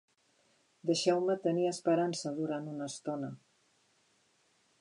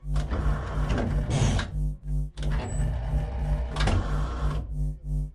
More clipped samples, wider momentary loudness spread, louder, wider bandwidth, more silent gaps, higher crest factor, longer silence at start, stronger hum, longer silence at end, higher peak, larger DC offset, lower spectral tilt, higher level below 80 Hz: neither; first, 11 LU vs 7 LU; second, -33 LUFS vs -29 LUFS; about the same, 11 kHz vs 11 kHz; neither; first, 20 dB vs 14 dB; first, 0.85 s vs 0 s; neither; first, 1.45 s vs 0.05 s; second, -16 dBFS vs -12 dBFS; neither; about the same, -5 dB/octave vs -6 dB/octave; second, -88 dBFS vs -28 dBFS